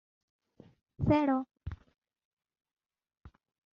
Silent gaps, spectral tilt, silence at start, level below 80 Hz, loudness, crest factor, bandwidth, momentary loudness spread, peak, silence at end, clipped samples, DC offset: 2.25-2.37 s; -7.5 dB/octave; 1 s; -56 dBFS; -30 LUFS; 22 dB; 6.6 kHz; 19 LU; -14 dBFS; 0.45 s; under 0.1%; under 0.1%